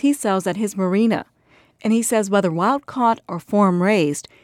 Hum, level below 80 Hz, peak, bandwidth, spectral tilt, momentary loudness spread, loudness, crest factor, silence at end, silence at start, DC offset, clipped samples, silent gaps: none; -66 dBFS; -4 dBFS; 15.5 kHz; -5.5 dB/octave; 6 LU; -19 LUFS; 14 dB; 0.2 s; 0.05 s; under 0.1%; under 0.1%; none